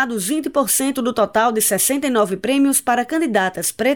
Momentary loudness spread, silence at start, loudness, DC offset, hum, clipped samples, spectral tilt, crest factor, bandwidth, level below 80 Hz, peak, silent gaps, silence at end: 4 LU; 0 s; -17 LUFS; 0.2%; none; under 0.1%; -3 dB/octave; 12 dB; 19 kHz; -58 dBFS; -6 dBFS; none; 0 s